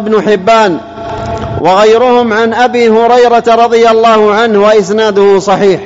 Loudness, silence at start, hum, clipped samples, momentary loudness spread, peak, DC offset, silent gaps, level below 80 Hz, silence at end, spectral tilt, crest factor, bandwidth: -7 LUFS; 0 s; none; 0.3%; 9 LU; 0 dBFS; 0.5%; none; -40 dBFS; 0 s; -5 dB/octave; 6 dB; 8 kHz